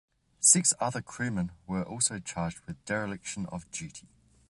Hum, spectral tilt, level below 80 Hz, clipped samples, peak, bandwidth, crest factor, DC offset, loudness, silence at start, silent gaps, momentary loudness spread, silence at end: none; -3 dB/octave; -58 dBFS; under 0.1%; -8 dBFS; 12 kHz; 24 dB; under 0.1%; -28 LUFS; 0.4 s; none; 18 LU; 0.5 s